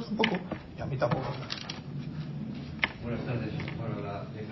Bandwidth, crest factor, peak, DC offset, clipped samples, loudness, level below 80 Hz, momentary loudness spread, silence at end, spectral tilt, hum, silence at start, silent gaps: 6.2 kHz; 26 dB; -8 dBFS; under 0.1%; under 0.1%; -34 LUFS; -52 dBFS; 9 LU; 0 s; -6.5 dB/octave; none; 0 s; none